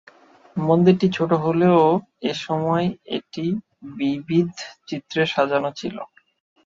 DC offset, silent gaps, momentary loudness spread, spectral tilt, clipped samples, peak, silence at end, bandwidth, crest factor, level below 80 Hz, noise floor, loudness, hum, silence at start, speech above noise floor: under 0.1%; none; 16 LU; -7 dB/octave; under 0.1%; -2 dBFS; 0.6 s; 7.6 kHz; 18 dB; -62 dBFS; -48 dBFS; -21 LUFS; none; 0.55 s; 28 dB